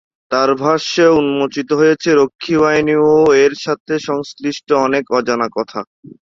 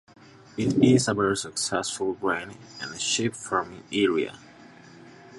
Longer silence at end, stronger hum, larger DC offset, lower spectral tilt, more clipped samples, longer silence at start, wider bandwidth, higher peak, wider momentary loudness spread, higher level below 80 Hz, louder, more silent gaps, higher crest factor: first, 0.55 s vs 0 s; neither; neither; about the same, -5 dB/octave vs -4 dB/octave; neither; second, 0.3 s vs 0.55 s; second, 7.6 kHz vs 11.5 kHz; first, 0 dBFS vs -6 dBFS; second, 11 LU vs 15 LU; about the same, -54 dBFS vs -58 dBFS; first, -14 LUFS vs -25 LUFS; first, 3.80-3.86 s vs none; second, 14 dB vs 20 dB